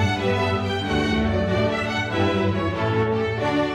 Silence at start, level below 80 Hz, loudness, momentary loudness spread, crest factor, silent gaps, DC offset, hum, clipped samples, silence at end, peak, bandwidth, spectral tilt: 0 s; -40 dBFS; -22 LUFS; 2 LU; 12 dB; none; under 0.1%; none; under 0.1%; 0 s; -8 dBFS; 11 kHz; -6.5 dB/octave